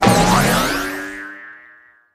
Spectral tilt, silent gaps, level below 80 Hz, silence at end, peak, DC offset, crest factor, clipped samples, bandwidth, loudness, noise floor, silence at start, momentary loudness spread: -4 dB/octave; none; -36 dBFS; 0.55 s; 0 dBFS; under 0.1%; 18 dB; under 0.1%; 15.5 kHz; -16 LUFS; -48 dBFS; 0 s; 22 LU